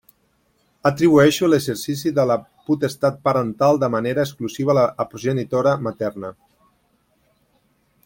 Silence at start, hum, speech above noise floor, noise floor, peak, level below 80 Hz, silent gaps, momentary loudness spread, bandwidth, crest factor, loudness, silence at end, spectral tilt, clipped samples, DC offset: 0.85 s; none; 45 dB; -64 dBFS; -2 dBFS; -58 dBFS; none; 10 LU; 17 kHz; 18 dB; -19 LUFS; 1.75 s; -6 dB/octave; under 0.1%; under 0.1%